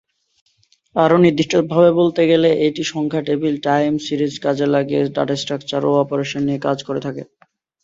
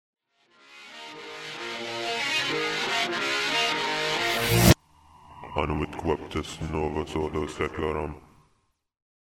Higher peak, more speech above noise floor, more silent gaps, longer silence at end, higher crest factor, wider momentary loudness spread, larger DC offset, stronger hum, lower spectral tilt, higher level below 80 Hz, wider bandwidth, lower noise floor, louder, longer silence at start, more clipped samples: about the same, -2 dBFS vs -2 dBFS; second, 35 dB vs 42 dB; neither; second, 0.6 s vs 1.2 s; second, 16 dB vs 26 dB; second, 9 LU vs 17 LU; neither; neither; first, -6 dB/octave vs -4 dB/octave; second, -58 dBFS vs -42 dBFS; second, 7.8 kHz vs 16 kHz; second, -51 dBFS vs -71 dBFS; first, -17 LUFS vs -26 LUFS; first, 0.95 s vs 0.7 s; neither